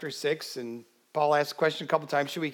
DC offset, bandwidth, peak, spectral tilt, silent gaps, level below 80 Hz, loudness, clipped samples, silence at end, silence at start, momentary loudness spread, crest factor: under 0.1%; 19 kHz; -10 dBFS; -4.5 dB/octave; none; under -90 dBFS; -29 LUFS; under 0.1%; 0 s; 0 s; 13 LU; 20 dB